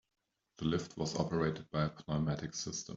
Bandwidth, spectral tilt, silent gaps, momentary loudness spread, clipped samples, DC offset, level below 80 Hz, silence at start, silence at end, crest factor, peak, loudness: 7.8 kHz; -5.5 dB/octave; none; 5 LU; under 0.1%; under 0.1%; -60 dBFS; 0.6 s; 0 s; 20 dB; -18 dBFS; -37 LUFS